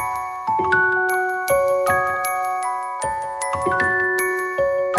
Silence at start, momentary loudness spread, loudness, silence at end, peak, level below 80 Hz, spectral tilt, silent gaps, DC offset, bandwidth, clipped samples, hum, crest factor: 0 s; 8 LU; -20 LUFS; 0 s; -6 dBFS; -52 dBFS; -3.5 dB/octave; none; under 0.1%; 12 kHz; under 0.1%; none; 16 dB